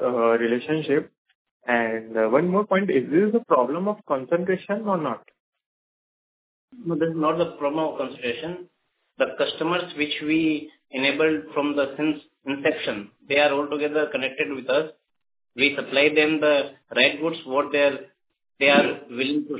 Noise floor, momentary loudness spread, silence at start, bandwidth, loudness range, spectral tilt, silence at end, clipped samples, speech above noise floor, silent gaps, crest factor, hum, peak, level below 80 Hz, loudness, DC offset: under -90 dBFS; 10 LU; 0 s; 4 kHz; 6 LU; -9 dB/octave; 0 s; under 0.1%; over 67 dB; 1.18-1.25 s, 1.35-1.45 s, 1.51-1.60 s, 5.40-5.53 s, 5.66-6.68 s; 20 dB; none; -4 dBFS; -68 dBFS; -23 LUFS; under 0.1%